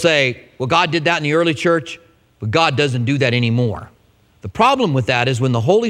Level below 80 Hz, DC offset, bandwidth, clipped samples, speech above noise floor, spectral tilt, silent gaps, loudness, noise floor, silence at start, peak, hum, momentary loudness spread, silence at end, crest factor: -50 dBFS; under 0.1%; 11.5 kHz; under 0.1%; 37 dB; -5.5 dB/octave; none; -16 LUFS; -53 dBFS; 0 s; 0 dBFS; none; 14 LU; 0 s; 16 dB